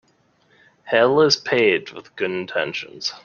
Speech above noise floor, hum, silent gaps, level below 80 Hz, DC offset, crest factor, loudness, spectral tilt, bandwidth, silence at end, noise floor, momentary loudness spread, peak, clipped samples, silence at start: 41 dB; none; none; -64 dBFS; under 0.1%; 18 dB; -20 LUFS; -3.5 dB/octave; 7.2 kHz; 0.05 s; -61 dBFS; 12 LU; -2 dBFS; under 0.1%; 0.85 s